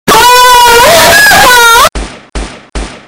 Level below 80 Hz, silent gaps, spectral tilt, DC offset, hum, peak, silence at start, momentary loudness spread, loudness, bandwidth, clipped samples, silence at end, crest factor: -24 dBFS; none; -1 dB/octave; under 0.1%; none; 0 dBFS; 0.05 s; 20 LU; -1 LUFS; over 20 kHz; 9%; 0.1 s; 4 dB